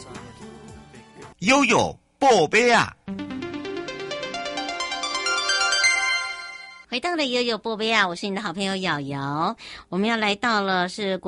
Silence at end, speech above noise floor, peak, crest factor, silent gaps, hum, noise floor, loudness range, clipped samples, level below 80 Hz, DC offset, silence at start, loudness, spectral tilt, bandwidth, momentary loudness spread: 0 s; 23 dB; -6 dBFS; 18 dB; none; none; -45 dBFS; 3 LU; under 0.1%; -56 dBFS; under 0.1%; 0 s; -22 LUFS; -3 dB/octave; 11.5 kHz; 15 LU